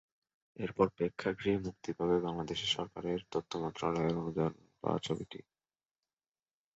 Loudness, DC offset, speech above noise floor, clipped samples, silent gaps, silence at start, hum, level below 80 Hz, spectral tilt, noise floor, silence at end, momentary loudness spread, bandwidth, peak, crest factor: -36 LUFS; under 0.1%; over 55 dB; under 0.1%; none; 0.6 s; none; -62 dBFS; -4.5 dB/octave; under -90 dBFS; 1.35 s; 8 LU; 8 kHz; -14 dBFS; 22 dB